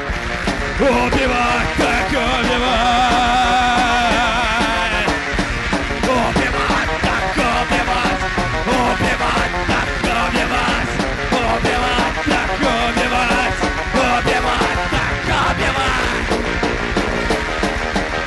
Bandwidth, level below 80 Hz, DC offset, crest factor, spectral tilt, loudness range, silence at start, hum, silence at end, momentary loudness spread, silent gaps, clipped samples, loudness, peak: 11.5 kHz; -28 dBFS; under 0.1%; 12 dB; -4 dB/octave; 2 LU; 0 s; none; 0 s; 5 LU; none; under 0.1%; -17 LUFS; -6 dBFS